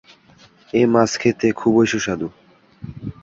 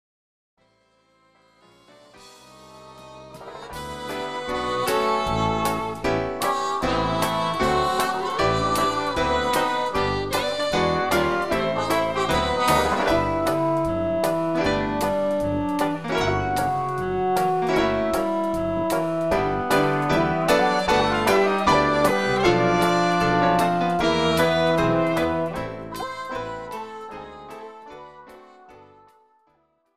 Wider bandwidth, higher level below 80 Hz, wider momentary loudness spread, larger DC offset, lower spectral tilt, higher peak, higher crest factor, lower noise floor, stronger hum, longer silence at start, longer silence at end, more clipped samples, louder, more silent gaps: second, 7.8 kHz vs 15.5 kHz; second, -52 dBFS vs -44 dBFS; first, 17 LU vs 13 LU; second, under 0.1% vs 0.5%; about the same, -5.5 dB/octave vs -5 dB/octave; first, -2 dBFS vs -6 dBFS; about the same, 18 dB vs 18 dB; second, -51 dBFS vs -65 dBFS; neither; second, 0.75 s vs 1.9 s; second, 0.1 s vs 0.95 s; neither; first, -18 LUFS vs -22 LUFS; neither